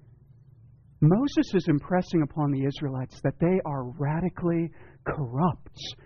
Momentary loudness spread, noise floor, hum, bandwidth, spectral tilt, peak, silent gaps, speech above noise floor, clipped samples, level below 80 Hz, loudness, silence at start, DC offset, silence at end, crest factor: 10 LU; -54 dBFS; none; 6.8 kHz; -7.5 dB/octave; -12 dBFS; none; 28 dB; under 0.1%; -52 dBFS; -27 LUFS; 1 s; under 0.1%; 0.1 s; 16 dB